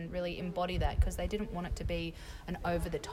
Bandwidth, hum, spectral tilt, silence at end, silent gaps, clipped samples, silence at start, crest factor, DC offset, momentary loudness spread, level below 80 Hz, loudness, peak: 16 kHz; none; -6 dB/octave; 0 s; none; under 0.1%; 0 s; 18 dB; under 0.1%; 7 LU; -40 dBFS; -36 LUFS; -18 dBFS